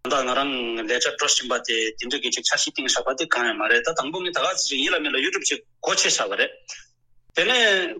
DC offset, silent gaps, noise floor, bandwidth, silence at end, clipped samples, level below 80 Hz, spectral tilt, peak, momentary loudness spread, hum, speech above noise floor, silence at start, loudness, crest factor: under 0.1%; none; -57 dBFS; 13.5 kHz; 0 s; under 0.1%; -62 dBFS; 0 dB/octave; -2 dBFS; 7 LU; none; 34 dB; 0.05 s; -21 LUFS; 22 dB